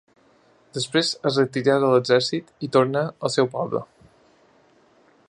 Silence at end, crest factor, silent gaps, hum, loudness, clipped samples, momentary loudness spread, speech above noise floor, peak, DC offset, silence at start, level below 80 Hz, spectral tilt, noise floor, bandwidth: 1.45 s; 20 dB; none; none; -22 LUFS; under 0.1%; 11 LU; 37 dB; -4 dBFS; under 0.1%; 0.75 s; -68 dBFS; -5 dB/octave; -58 dBFS; 11.5 kHz